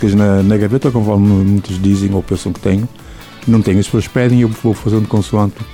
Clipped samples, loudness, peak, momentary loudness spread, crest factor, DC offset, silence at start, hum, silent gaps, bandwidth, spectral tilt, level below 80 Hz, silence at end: under 0.1%; -13 LUFS; -2 dBFS; 6 LU; 12 dB; under 0.1%; 0 s; none; none; 15 kHz; -7.5 dB/octave; -36 dBFS; 0 s